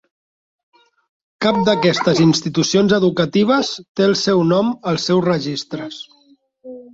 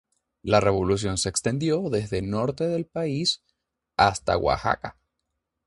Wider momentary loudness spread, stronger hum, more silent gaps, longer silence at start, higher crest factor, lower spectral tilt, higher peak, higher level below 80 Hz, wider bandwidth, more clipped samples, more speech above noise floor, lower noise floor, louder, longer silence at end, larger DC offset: first, 14 LU vs 8 LU; neither; first, 3.88-3.95 s vs none; first, 1.4 s vs 0.45 s; second, 16 dB vs 22 dB; about the same, -5 dB/octave vs -4.5 dB/octave; about the same, -2 dBFS vs -4 dBFS; second, -56 dBFS vs -46 dBFS; second, 8 kHz vs 11.5 kHz; neither; second, 38 dB vs 56 dB; second, -54 dBFS vs -80 dBFS; first, -16 LUFS vs -25 LUFS; second, 0.1 s vs 0.75 s; neither